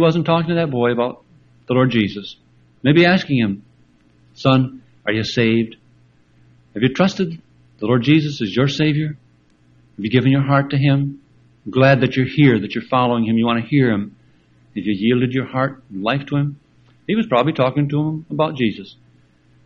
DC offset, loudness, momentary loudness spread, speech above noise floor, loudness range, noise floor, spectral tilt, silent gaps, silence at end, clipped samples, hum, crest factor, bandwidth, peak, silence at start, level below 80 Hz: under 0.1%; -18 LUFS; 12 LU; 37 dB; 4 LU; -54 dBFS; -7.5 dB/octave; none; 0.75 s; under 0.1%; none; 18 dB; 7.2 kHz; 0 dBFS; 0 s; -54 dBFS